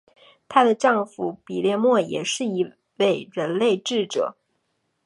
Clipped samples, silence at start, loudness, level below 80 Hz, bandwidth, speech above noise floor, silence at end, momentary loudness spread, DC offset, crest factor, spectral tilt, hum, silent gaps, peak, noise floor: under 0.1%; 0.5 s; -22 LUFS; -74 dBFS; 11.5 kHz; 51 dB; 0.75 s; 10 LU; under 0.1%; 22 dB; -4.5 dB/octave; none; none; -2 dBFS; -73 dBFS